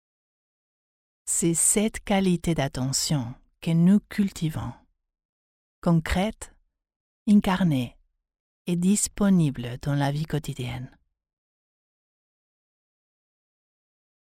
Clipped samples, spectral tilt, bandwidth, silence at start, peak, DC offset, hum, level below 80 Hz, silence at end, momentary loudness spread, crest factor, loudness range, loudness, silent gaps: under 0.1%; -5 dB/octave; 16 kHz; 1.25 s; -8 dBFS; under 0.1%; none; -46 dBFS; 3.5 s; 16 LU; 20 dB; 9 LU; -24 LUFS; 5.25-5.82 s, 6.96-7.26 s, 8.40-8.65 s